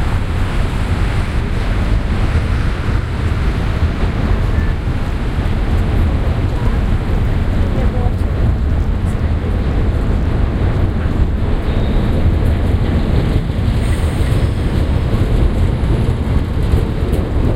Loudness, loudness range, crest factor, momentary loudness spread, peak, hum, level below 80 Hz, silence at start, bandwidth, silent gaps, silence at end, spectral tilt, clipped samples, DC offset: -17 LUFS; 2 LU; 14 dB; 3 LU; 0 dBFS; none; -16 dBFS; 0 s; 12.5 kHz; none; 0 s; -7.5 dB/octave; under 0.1%; under 0.1%